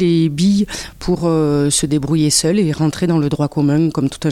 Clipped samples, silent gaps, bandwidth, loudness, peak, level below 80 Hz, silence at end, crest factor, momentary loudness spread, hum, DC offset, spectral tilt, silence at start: under 0.1%; none; 15 kHz; -16 LUFS; -2 dBFS; -40 dBFS; 0 s; 14 dB; 5 LU; none; under 0.1%; -5.5 dB/octave; 0 s